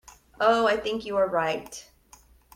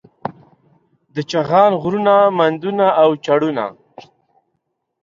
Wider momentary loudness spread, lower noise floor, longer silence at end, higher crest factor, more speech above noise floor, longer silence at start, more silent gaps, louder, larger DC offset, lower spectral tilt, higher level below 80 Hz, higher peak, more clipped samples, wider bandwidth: about the same, 15 LU vs 16 LU; second, -56 dBFS vs -72 dBFS; second, 0.75 s vs 1.3 s; about the same, 18 dB vs 16 dB; second, 31 dB vs 58 dB; first, 0.4 s vs 0.25 s; neither; second, -25 LUFS vs -15 LUFS; neither; second, -4 dB/octave vs -6.5 dB/octave; about the same, -58 dBFS vs -62 dBFS; second, -8 dBFS vs -2 dBFS; neither; first, 16 kHz vs 7.4 kHz